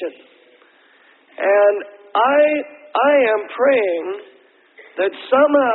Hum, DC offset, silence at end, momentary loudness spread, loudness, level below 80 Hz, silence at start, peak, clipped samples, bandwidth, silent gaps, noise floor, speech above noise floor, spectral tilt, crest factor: none; under 0.1%; 0 s; 13 LU; -17 LUFS; -70 dBFS; 0 s; -2 dBFS; under 0.1%; 4.2 kHz; none; -52 dBFS; 36 dB; -8.5 dB/octave; 16 dB